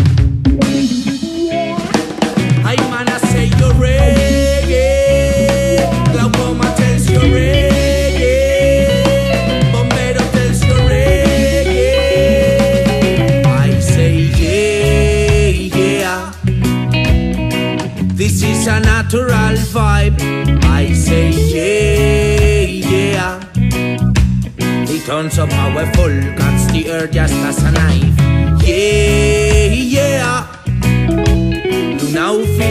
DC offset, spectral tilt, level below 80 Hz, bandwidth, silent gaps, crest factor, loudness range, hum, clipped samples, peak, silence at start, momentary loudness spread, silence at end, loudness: under 0.1%; -6 dB/octave; -18 dBFS; 15 kHz; none; 12 dB; 3 LU; none; under 0.1%; 0 dBFS; 0 s; 5 LU; 0 s; -13 LUFS